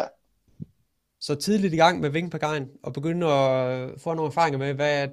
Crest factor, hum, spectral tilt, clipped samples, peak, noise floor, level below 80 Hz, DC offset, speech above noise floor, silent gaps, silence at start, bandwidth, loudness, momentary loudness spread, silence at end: 20 dB; none; -5.5 dB/octave; under 0.1%; -6 dBFS; -72 dBFS; -62 dBFS; under 0.1%; 48 dB; none; 0 s; 14.5 kHz; -24 LUFS; 16 LU; 0 s